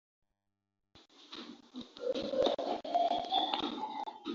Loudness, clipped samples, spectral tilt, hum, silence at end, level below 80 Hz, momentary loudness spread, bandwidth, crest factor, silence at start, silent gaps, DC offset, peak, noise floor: -34 LUFS; under 0.1%; -1 dB/octave; none; 0 s; -72 dBFS; 17 LU; 7.6 kHz; 20 dB; 0.95 s; none; under 0.1%; -16 dBFS; -86 dBFS